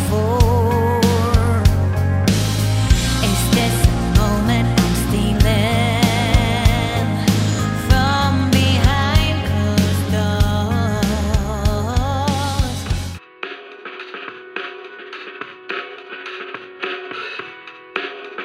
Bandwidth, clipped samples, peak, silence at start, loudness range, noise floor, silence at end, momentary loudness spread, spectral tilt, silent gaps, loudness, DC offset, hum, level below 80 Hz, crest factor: 16 kHz; under 0.1%; 0 dBFS; 0 s; 13 LU; -37 dBFS; 0 s; 16 LU; -5.5 dB/octave; none; -17 LUFS; under 0.1%; none; -24 dBFS; 16 dB